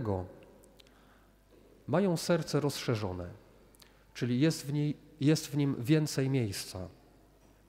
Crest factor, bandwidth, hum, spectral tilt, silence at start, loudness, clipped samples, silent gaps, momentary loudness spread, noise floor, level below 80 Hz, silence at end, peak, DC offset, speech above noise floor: 18 dB; 16 kHz; none; -6 dB/octave; 0 s; -32 LUFS; under 0.1%; none; 16 LU; -62 dBFS; -64 dBFS; 0.75 s; -14 dBFS; under 0.1%; 31 dB